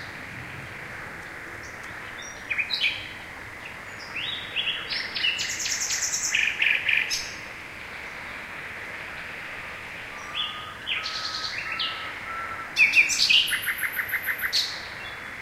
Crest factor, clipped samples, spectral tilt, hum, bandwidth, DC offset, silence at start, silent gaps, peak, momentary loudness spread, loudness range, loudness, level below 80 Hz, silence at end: 22 dB; under 0.1%; 0.5 dB/octave; none; 16 kHz; under 0.1%; 0 s; none; -6 dBFS; 17 LU; 10 LU; -25 LUFS; -56 dBFS; 0 s